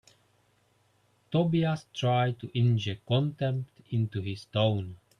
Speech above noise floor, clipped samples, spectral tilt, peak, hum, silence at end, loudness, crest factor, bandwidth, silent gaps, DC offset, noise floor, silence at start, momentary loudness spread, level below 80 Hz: 40 dB; under 0.1%; -7.5 dB/octave; -14 dBFS; none; 0.25 s; -29 LUFS; 16 dB; 9.6 kHz; none; under 0.1%; -68 dBFS; 1.3 s; 7 LU; -66 dBFS